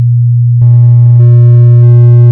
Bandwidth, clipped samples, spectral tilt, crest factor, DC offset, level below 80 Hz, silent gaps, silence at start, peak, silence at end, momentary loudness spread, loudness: 1.6 kHz; 20%; -13 dB/octave; 2 dB; under 0.1%; -40 dBFS; none; 0 s; 0 dBFS; 0 s; 4 LU; -4 LUFS